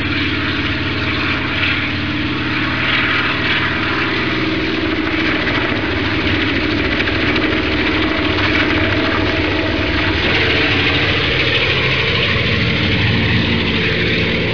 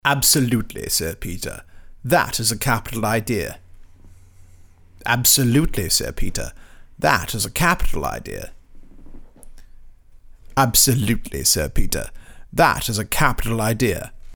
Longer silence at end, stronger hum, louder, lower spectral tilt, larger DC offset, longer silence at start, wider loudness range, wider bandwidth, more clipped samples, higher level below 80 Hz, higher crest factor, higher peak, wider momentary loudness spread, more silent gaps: about the same, 0 s vs 0 s; neither; first, -15 LUFS vs -19 LUFS; first, -6 dB/octave vs -3 dB/octave; first, 2% vs under 0.1%; about the same, 0 s vs 0.05 s; second, 2 LU vs 5 LU; second, 5.4 kHz vs over 20 kHz; neither; about the same, -32 dBFS vs -32 dBFS; second, 14 dB vs 20 dB; about the same, -2 dBFS vs -2 dBFS; second, 4 LU vs 16 LU; neither